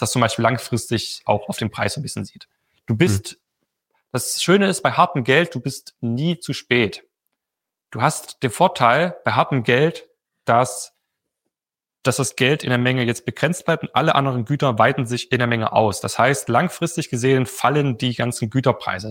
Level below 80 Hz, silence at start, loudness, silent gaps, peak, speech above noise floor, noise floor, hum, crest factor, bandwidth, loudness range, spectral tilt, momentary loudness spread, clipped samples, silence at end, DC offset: -58 dBFS; 0 s; -20 LUFS; none; -2 dBFS; 70 dB; -90 dBFS; none; 20 dB; 17 kHz; 4 LU; -5 dB/octave; 10 LU; under 0.1%; 0 s; under 0.1%